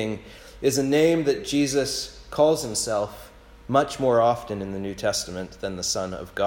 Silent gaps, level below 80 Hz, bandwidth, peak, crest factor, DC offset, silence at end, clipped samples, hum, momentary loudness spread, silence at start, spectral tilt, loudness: none; -50 dBFS; 17.5 kHz; -6 dBFS; 18 dB; under 0.1%; 0 s; under 0.1%; none; 12 LU; 0 s; -4 dB/octave; -24 LUFS